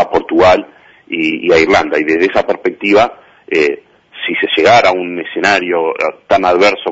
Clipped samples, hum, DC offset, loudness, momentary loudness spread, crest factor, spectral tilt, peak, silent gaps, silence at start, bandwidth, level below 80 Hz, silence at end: under 0.1%; none; under 0.1%; -12 LUFS; 9 LU; 12 dB; -4.5 dB/octave; 0 dBFS; none; 0 s; 8 kHz; -44 dBFS; 0 s